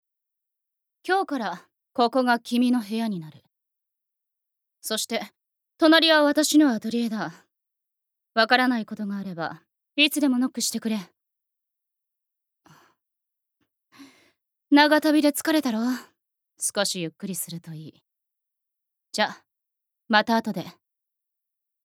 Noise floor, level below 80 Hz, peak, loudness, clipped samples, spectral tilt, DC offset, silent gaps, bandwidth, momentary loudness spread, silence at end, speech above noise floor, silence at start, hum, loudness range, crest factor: -84 dBFS; -82 dBFS; -2 dBFS; -23 LUFS; under 0.1%; -3 dB/octave; under 0.1%; none; 17 kHz; 16 LU; 1.15 s; 61 dB; 1.05 s; none; 9 LU; 24 dB